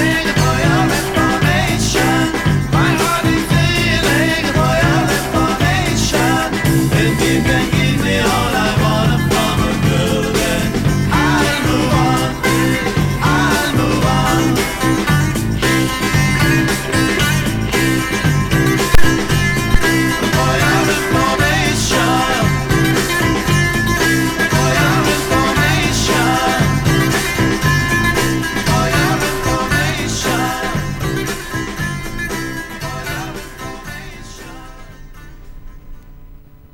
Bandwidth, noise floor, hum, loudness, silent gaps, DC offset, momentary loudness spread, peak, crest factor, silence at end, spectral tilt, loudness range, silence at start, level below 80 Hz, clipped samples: over 20 kHz; -38 dBFS; none; -15 LUFS; none; under 0.1%; 7 LU; 0 dBFS; 14 dB; 0.35 s; -4.5 dB/octave; 7 LU; 0 s; -26 dBFS; under 0.1%